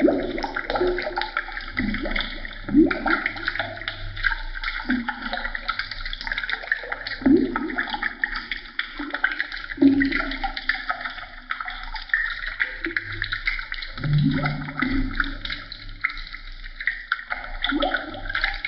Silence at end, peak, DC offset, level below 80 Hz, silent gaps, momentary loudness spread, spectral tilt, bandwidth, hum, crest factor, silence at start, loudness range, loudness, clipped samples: 0 s; -6 dBFS; under 0.1%; -36 dBFS; none; 11 LU; -3.5 dB/octave; 6 kHz; none; 20 dB; 0 s; 3 LU; -25 LUFS; under 0.1%